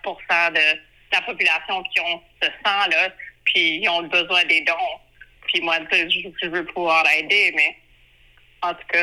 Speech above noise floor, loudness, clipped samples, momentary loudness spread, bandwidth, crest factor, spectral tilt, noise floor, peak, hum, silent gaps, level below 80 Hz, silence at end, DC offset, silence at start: 33 dB; -19 LUFS; under 0.1%; 10 LU; 14.5 kHz; 16 dB; -2 dB/octave; -54 dBFS; -6 dBFS; none; none; -60 dBFS; 0 s; under 0.1%; 0.05 s